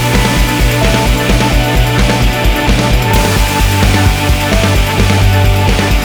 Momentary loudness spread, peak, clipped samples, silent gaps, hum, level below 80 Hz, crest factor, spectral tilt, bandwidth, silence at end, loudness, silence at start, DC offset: 1 LU; 0 dBFS; under 0.1%; none; none; -14 dBFS; 10 dB; -5 dB/octave; over 20 kHz; 0 s; -11 LUFS; 0 s; under 0.1%